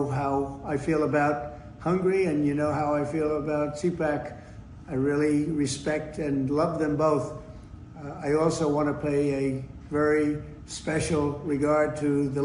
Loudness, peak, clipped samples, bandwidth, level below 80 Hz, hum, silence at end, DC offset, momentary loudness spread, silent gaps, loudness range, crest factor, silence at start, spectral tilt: -27 LUFS; -12 dBFS; under 0.1%; 10.5 kHz; -50 dBFS; none; 0 s; under 0.1%; 13 LU; none; 1 LU; 14 dB; 0 s; -6.5 dB/octave